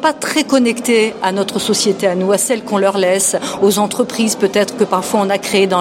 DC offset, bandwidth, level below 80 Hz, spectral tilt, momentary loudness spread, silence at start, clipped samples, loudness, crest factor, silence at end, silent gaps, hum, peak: under 0.1%; 16.5 kHz; -58 dBFS; -3.5 dB/octave; 3 LU; 0 s; under 0.1%; -14 LUFS; 14 dB; 0 s; none; none; 0 dBFS